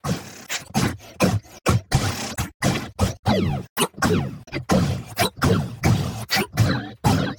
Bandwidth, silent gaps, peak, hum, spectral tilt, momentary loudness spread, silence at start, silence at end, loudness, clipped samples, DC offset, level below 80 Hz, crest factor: 18 kHz; 2.54-2.60 s, 3.19-3.23 s, 3.70-3.76 s; -6 dBFS; none; -5 dB/octave; 6 LU; 0.05 s; 0 s; -23 LUFS; under 0.1%; under 0.1%; -40 dBFS; 18 dB